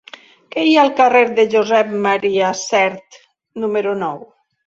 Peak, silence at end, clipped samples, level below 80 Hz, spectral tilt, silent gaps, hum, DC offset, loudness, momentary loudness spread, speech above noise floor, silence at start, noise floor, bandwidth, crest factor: -2 dBFS; 0.45 s; under 0.1%; -64 dBFS; -4 dB/octave; none; none; under 0.1%; -15 LUFS; 14 LU; 24 dB; 0.55 s; -39 dBFS; 8 kHz; 16 dB